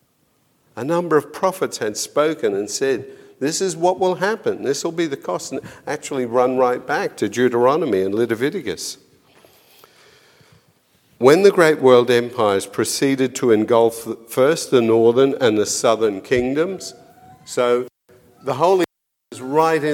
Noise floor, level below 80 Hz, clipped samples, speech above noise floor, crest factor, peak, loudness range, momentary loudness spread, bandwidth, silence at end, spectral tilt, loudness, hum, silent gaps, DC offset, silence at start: -62 dBFS; -60 dBFS; under 0.1%; 45 dB; 18 dB; 0 dBFS; 6 LU; 13 LU; 17 kHz; 0 s; -4.5 dB/octave; -18 LUFS; none; none; under 0.1%; 0.75 s